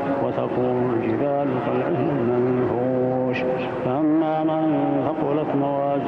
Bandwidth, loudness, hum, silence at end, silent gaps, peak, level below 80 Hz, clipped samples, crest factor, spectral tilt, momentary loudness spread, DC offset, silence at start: 5.8 kHz; -22 LUFS; none; 0 s; none; -8 dBFS; -56 dBFS; under 0.1%; 14 dB; -10 dB/octave; 3 LU; under 0.1%; 0 s